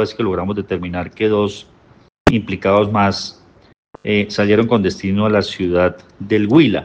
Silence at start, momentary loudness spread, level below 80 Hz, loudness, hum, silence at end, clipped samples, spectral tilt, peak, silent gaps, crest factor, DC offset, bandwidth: 0 s; 10 LU; -42 dBFS; -17 LUFS; none; 0 s; under 0.1%; -6.5 dB/octave; 0 dBFS; 2.20-2.25 s, 3.78-3.83 s; 16 dB; under 0.1%; 8.8 kHz